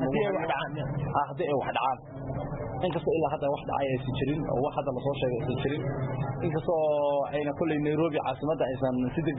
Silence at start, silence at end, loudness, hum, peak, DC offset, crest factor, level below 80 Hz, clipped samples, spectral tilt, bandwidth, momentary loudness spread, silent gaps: 0 s; 0 s; -29 LUFS; none; -14 dBFS; under 0.1%; 14 dB; -50 dBFS; under 0.1%; -11 dB/octave; 4 kHz; 5 LU; none